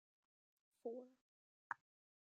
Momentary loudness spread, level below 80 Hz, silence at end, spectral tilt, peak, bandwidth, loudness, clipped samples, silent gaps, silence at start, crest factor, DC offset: 5 LU; under -90 dBFS; 0.5 s; -5.5 dB/octave; -28 dBFS; 9.6 kHz; -54 LUFS; under 0.1%; 1.21-1.70 s; 0.85 s; 30 dB; under 0.1%